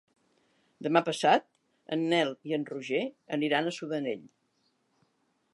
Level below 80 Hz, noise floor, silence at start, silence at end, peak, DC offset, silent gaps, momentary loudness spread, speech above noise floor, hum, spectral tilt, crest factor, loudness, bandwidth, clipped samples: -86 dBFS; -74 dBFS; 0.8 s; 1.25 s; -8 dBFS; under 0.1%; none; 10 LU; 45 dB; none; -5 dB/octave; 22 dB; -30 LUFS; 11.5 kHz; under 0.1%